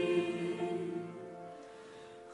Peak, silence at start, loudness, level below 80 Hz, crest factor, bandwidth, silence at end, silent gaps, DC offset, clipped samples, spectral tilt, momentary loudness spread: -20 dBFS; 0 s; -38 LUFS; -78 dBFS; 18 dB; 11 kHz; 0 s; none; under 0.1%; under 0.1%; -6.5 dB/octave; 18 LU